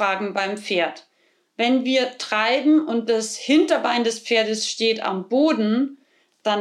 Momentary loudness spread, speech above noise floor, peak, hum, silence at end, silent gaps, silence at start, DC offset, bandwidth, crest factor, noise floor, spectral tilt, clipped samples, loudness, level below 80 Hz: 7 LU; 41 dB; -6 dBFS; none; 0 s; none; 0 s; under 0.1%; 12 kHz; 16 dB; -61 dBFS; -3.5 dB/octave; under 0.1%; -21 LUFS; -76 dBFS